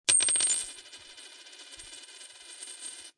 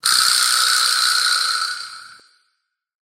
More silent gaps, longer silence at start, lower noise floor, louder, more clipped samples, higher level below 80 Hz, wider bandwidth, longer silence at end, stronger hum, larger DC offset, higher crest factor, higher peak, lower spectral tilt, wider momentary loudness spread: neither; about the same, 0.1 s vs 0.05 s; second, -50 dBFS vs -73 dBFS; second, -26 LUFS vs -15 LUFS; neither; first, -72 dBFS vs -78 dBFS; second, 11.5 kHz vs 17.5 kHz; second, 0.1 s vs 0.95 s; neither; neither; first, 26 dB vs 18 dB; second, -6 dBFS vs -2 dBFS; first, 2.5 dB/octave vs 4.5 dB/octave; first, 24 LU vs 12 LU